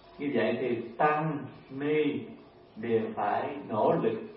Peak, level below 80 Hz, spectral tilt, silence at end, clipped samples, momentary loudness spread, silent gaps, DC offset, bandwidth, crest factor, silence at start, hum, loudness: -12 dBFS; -70 dBFS; -10.5 dB/octave; 0 s; under 0.1%; 12 LU; none; under 0.1%; 5.6 kHz; 18 dB; 0.05 s; none; -30 LUFS